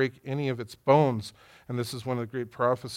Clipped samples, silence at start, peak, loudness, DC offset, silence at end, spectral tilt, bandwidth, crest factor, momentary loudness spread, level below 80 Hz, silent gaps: under 0.1%; 0 s; -8 dBFS; -28 LUFS; under 0.1%; 0 s; -6.5 dB/octave; 16.5 kHz; 20 dB; 13 LU; -68 dBFS; none